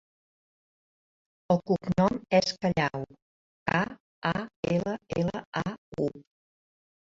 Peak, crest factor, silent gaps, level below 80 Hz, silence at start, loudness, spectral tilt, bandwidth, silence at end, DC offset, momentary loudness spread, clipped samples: -10 dBFS; 22 dB; 3.22-3.66 s, 4.00-4.22 s, 4.56-4.63 s, 5.46-5.52 s, 5.78-5.92 s; -56 dBFS; 1.5 s; -29 LUFS; -6 dB/octave; 7.8 kHz; 0.8 s; under 0.1%; 9 LU; under 0.1%